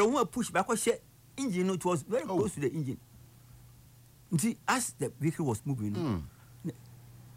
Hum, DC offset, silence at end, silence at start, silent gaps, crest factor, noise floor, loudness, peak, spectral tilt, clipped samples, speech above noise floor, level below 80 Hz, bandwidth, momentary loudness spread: none; under 0.1%; 0 s; 0 s; none; 16 dB; -57 dBFS; -32 LUFS; -16 dBFS; -5 dB/octave; under 0.1%; 26 dB; -60 dBFS; 16 kHz; 14 LU